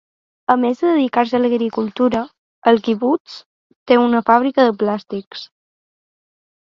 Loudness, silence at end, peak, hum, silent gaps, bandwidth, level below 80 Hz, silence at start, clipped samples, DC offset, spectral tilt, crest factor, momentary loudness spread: -17 LUFS; 1.25 s; 0 dBFS; none; 2.38-2.62 s, 3.20-3.25 s, 3.46-3.70 s, 3.76-3.86 s, 5.27-5.31 s; 7 kHz; -60 dBFS; 0.5 s; under 0.1%; under 0.1%; -6.5 dB/octave; 18 dB; 14 LU